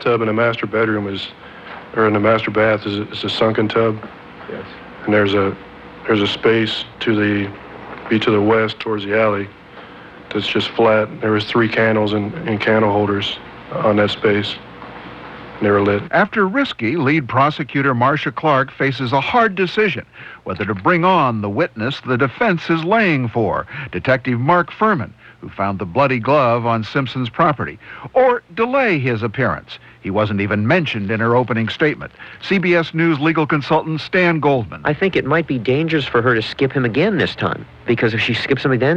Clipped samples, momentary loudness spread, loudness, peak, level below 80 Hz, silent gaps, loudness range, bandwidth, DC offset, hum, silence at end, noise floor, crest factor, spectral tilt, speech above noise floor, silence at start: under 0.1%; 15 LU; -17 LUFS; -2 dBFS; -50 dBFS; none; 2 LU; 8.4 kHz; under 0.1%; none; 0 s; -38 dBFS; 14 dB; -7.5 dB/octave; 21 dB; 0 s